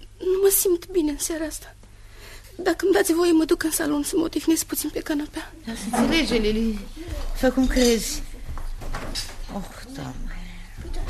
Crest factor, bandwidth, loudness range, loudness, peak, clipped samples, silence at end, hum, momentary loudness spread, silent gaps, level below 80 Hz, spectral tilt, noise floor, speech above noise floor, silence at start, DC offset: 18 dB; 14 kHz; 3 LU; -23 LUFS; -6 dBFS; under 0.1%; 0 s; none; 18 LU; none; -34 dBFS; -3.5 dB/octave; -43 dBFS; 21 dB; 0 s; under 0.1%